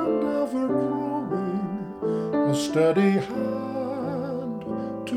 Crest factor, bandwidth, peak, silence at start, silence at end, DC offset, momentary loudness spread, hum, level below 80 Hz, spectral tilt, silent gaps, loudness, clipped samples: 14 dB; 14.5 kHz; -10 dBFS; 0 s; 0 s; under 0.1%; 9 LU; none; -62 dBFS; -6.5 dB/octave; none; -26 LUFS; under 0.1%